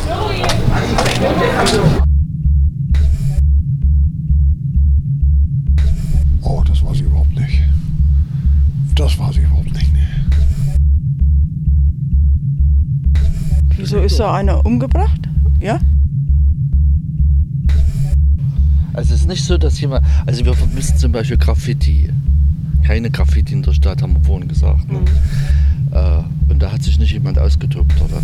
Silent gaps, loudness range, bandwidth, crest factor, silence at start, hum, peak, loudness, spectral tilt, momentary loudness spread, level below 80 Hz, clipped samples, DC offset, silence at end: none; 1 LU; 11.5 kHz; 12 dB; 0 s; none; 0 dBFS; -15 LUFS; -7 dB/octave; 2 LU; -14 dBFS; under 0.1%; under 0.1%; 0 s